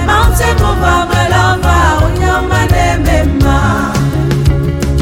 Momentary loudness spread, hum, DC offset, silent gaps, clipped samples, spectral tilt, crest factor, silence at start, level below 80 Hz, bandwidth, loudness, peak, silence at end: 3 LU; none; under 0.1%; none; under 0.1%; -5.5 dB/octave; 10 dB; 0 s; -16 dBFS; 16.5 kHz; -11 LUFS; 0 dBFS; 0 s